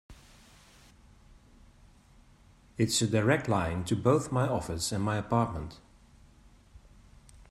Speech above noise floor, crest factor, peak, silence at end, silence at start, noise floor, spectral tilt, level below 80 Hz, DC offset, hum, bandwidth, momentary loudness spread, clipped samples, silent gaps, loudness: 30 dB; 20 dB; -12 dBFS; 0.7 s; 0.1 s; -59 dBFS; -5 dB/octave; -54 dBFS; under 0.1%; none; 13.5 kHz; 7 LU; under 0.1%; none; -29 LUFS